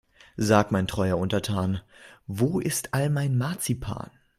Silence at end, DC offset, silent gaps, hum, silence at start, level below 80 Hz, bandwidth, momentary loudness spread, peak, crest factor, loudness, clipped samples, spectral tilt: 0.3 s; under 0.1%; none; none; 0.35 s; -50 dBFS; 16 kHz; 14 LU; -6 dBFS; 20 dB; -26 LUFS; under 0.1%; -5.5 dB/octave